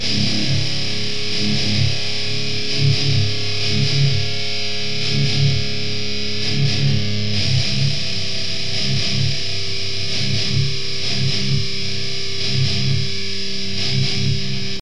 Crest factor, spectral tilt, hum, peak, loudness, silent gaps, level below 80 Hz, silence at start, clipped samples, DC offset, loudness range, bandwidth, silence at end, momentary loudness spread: 16 dB; -4 dB/octave; none; -4 dBFS; -20 LUFS; none; -42 dBFS; 0 s; under 0.1%; 10%; 2 LU; 10.5 kHz; 0 s; 5 LU